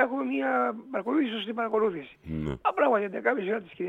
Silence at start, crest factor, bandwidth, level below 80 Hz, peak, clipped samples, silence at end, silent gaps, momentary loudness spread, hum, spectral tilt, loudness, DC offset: 0 s; 18 dB; 7.8 kHz; -56 dBFS; -10 dBFS; under 0.1%; 0 s; none; 9 LU; none; -7.5 dB/octave; -28 LUFS; under 0.1%